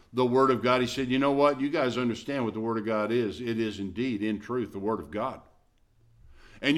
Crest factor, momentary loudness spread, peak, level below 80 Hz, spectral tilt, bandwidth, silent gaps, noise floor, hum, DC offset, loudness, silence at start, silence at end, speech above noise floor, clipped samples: 18 dB; 9 LU; -10 dBFS; -58 dBFS; -6 dB/octave; 13.5 kHz; none; -63 dBFS; none; under 0.1%; -28 LUFS; 0.15 s; 0 s; 36 dB; under 0.1%